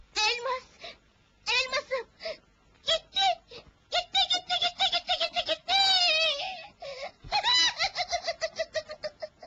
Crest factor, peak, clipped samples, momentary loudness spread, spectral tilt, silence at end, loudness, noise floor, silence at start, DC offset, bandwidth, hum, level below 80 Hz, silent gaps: 16 dB; -12 dBFS; under 0.1%; 18 LU; 0.5 dB/octave; 0 s; -26 LUFS; -63 dBFS; 0.15 s; under 0.1%; 8.4 kHz; none; -62 dBFS; none